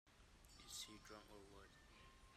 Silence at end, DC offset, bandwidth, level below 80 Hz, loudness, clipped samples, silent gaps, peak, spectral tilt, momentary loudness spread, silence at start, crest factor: 0 s; under 0.1%; 15 kHz; -72 dBFS; -59 LUFS; under 0.1%; none; -42 dBFS; -2 dB/octave; 13 LU; 0.05 s; 20 dB